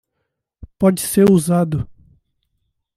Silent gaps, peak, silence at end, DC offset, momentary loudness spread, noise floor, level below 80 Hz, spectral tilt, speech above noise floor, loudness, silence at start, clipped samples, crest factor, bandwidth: none; -2 dBFS; 1.05 s; under 0.1%; 11 LU; -75 dBFS; -46 dBFS; -6.5 dB/octave; 61 dB; -16 LUFS; 0.6 s; under 0.1%; 16 dB; 16 kHz